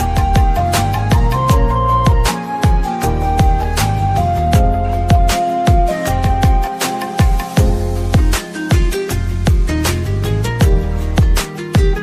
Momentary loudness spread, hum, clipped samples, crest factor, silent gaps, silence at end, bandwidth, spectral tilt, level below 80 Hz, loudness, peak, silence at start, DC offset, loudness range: 4 LU; none; under 0.1%; 12 dB; none; 0 s; 15.5 kHz; -6 dB/octave; -16 dBFS; -15 LUFS; 0 dBFS; 0 s; under 0.1%; 2 LU